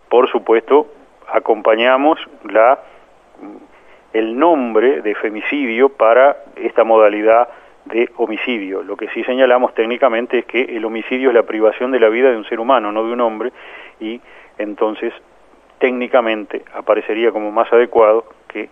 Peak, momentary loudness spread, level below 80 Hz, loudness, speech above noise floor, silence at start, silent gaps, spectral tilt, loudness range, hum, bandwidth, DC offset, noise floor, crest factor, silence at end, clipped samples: 0 dBFS; 13 LU; -62 dBFS; -15 LUFS; 33 dB; 0.1 s; none; -6.5 dB/octave; 6 LU; none; 3.7 kHz; under 0.1%; -48 dBFS; 16 dB; 0.05 s; under 0.1%